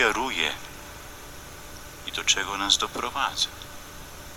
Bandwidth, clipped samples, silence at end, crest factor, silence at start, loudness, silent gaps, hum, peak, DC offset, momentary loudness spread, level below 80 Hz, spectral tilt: over 20 kHz; under 0.1%; 0 s; 24 dB; 0 s; -25 LUFS; none; none; -4 dBFS; under 0.1%; 19 LU; -48 dBFS; -0.5 dB/octave